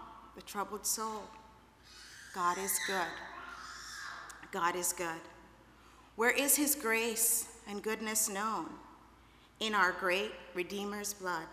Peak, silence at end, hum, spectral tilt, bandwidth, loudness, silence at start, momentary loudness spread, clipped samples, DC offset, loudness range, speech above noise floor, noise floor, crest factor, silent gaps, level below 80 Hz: -14 dBFS; 0 s; none; -1.5 dB/octave; 15.5 kHz; -33 LUFS; 0 s; 18 LU; under 0.1%; under 0.1%; 7 LU; 26 dB; -61 dBFS; 22 dB; none; -66 dBFS